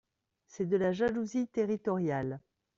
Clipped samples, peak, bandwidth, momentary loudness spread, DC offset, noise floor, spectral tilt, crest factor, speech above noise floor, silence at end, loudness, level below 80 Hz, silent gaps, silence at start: under 0.1%; -18 dBFS; 7.6 kHz; 8 LU; under 0.1%; -70 dBFS; -7 dB/octave; 14 dB; 39 dB; 0.4 s; -32 LUFS; -68 dBFS; none; 0.55 s